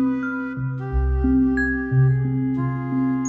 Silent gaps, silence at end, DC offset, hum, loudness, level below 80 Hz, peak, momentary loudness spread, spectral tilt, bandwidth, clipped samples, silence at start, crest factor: none; 0 s; under 0.1%; none; -22 LUFS; -30 dBFS; -8 dBFS; 8 LU; -8.5 dB/octave; 7.2 kHz; under 0.1%; 0 s; 12 dB